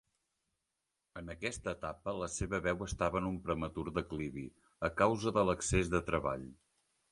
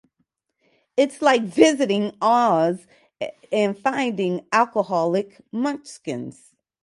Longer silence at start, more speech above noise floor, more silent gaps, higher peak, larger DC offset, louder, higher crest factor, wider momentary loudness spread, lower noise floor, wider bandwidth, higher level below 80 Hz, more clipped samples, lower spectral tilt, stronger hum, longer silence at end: first, 1.15 s vs 0.95 s; about the same, 51 dB vs 52 dB; neither; second, -14 dBFS vs 0 dBFS; neither; second, -36 LUFS vs -21 LUFS; about the same, 22 dB vs 22 dB; about the same, 14 LU vs 15 LU; first, -87 dBFS vs -73 dBFS; about the same, 11.5 kHz vs 11.5 kHz; first, -52 dBFS vs -72 dBFS; neither; about the same, -5 dB/octave vs -5 dB/octave; neither; about the same, 0.55 s vs 0.5 s